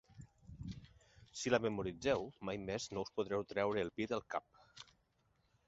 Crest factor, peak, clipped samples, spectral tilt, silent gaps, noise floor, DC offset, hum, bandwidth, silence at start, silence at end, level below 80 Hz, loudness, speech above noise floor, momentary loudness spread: 24 dB; -18 dBFS; under 0.1%; -4 dB/octave; none; -78 dBFS; under 0.1%; none; 7.6 kHz; 0.1 s; 0.85 s; -64 dBFS; -40 LUFS; 39 dB; 22 LU